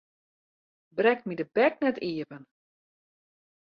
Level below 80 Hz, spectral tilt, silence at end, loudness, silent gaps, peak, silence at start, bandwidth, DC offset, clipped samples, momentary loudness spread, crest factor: -76 dBFS; -8 dB/octave; 1.3 s; -27 LUFS; none; -10 dBFS; 0.95 s; 5.4 kHz; under 0.1%; under 0.1%; 13 LU; 20 dB